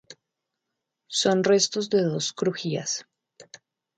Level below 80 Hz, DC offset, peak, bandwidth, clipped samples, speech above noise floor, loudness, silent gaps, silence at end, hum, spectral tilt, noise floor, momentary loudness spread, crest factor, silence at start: -72 dBFS; under 0.1%; -8 dBFS; 9.4 kHz; under 0.1%; 59 dB; -24 LUFS; none; 0.4 s; none; -3.5 dB/octave; -83 dBFS; 9 LU; 18 dB; 0.1 s